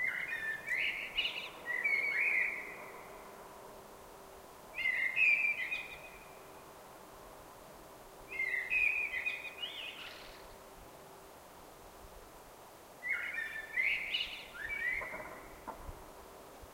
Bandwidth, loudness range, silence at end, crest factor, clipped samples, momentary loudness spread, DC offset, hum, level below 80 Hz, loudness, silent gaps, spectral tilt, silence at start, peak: 16 kHz; 9 LU; 0 s; 20 dB; under 0.1%; 24 LU; under 0.1%; none; -64 dBFS; -34 LUFS; none; -1.5 dB/octave; 0 s; -20 dBFS